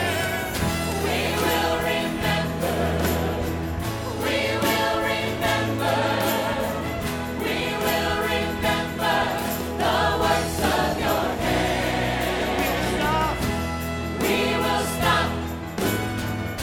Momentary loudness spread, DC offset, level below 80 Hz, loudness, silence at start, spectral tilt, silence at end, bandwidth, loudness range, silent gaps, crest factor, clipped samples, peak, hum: 6 LU; under 0.1%; -38 dBFS; -23 LUFS; 0 s; -4.5 dB/octave; 0 s; 19 kHz; 1 LU; none; 18 dB; under 0.1%; -6 dBFS; none